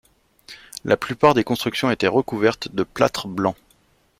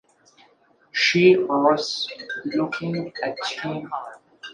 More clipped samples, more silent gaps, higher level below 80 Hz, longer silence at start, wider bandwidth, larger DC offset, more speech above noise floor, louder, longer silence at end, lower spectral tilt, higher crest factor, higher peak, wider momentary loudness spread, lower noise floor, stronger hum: neither; neither; first, -54 dBFS vs -70 dBFS; second, 0.5 s vs 0.95 s; first, 16 kHz vs 9.6 kHz; neither; about the same, 40 dB vs 37 dB; about the same, -21 LUFS vs -22 LUFS; first, 0.65 s vs 0 s; about the same, -5.5 dB/octave vs -5 dB/octave; about the same, 20 dB vs 20 dB; about the same, -2 dBFS vs -4 dBFS; about the same, 14 LU vs 16 LU; about the same, -60 dBFS vs -59 dBFS; neither